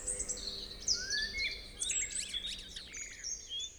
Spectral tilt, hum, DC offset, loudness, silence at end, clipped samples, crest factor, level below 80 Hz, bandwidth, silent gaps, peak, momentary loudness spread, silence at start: 1 dB/octave; none; under 0.1%; -36 LUFS; 0 s; under 0.1%; 20 dB; -54 dBFS; over 20 kHz; none; -20 dBFS; 10 LU; 0 s